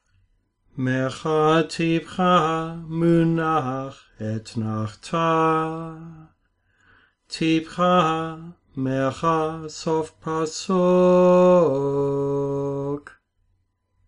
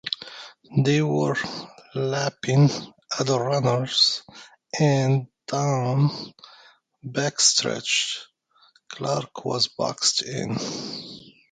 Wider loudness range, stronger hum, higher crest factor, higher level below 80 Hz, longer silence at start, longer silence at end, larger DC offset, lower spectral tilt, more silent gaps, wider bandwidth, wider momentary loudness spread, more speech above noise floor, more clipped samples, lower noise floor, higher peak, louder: first, 6 LU vs 3 LU; neither; about the same, 16 dB vs 20 dB; first, -56 dBFS vs -64 dBFS; first, 0.75 s vs 0.05 s; first, 1.05 s vs 0.3 s; neither; first, -6.5 dB/octave vs -4 dB/octave; neither; first, 10.5 kHz vs 9.4 kHz; about the same, 15 LU vs 16 LU; first, 47 dB vs 37 dB; neither; first, -69 dBFS vs -60 dBFS; about the same, -6 dBFS vs -4 dBFS; about the same, -22 LUFS vs -23 LUFS